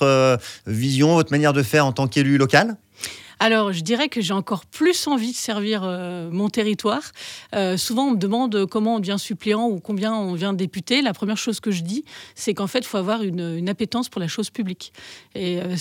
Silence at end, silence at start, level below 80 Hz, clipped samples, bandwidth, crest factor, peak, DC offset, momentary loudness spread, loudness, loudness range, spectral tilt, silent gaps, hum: 0 s; 0 s; -66 dBFS; under 0.1%; 17.5 kHz; 22 dB; 0 dBFS; under 0.1%; 11 LU; -21 LUFS; 6 LU; -5 dB/octave; none; none